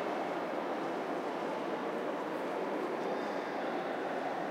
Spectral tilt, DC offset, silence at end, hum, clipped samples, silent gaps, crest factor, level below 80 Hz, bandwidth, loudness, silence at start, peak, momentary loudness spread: -5.5 dB/octave; under 0.1%; 0 s; none; under 0.1%; none; 14 dB; -86 dBFS; 16 kHz; -37 LUFS; 0 s; -22 dBFS; 1 LU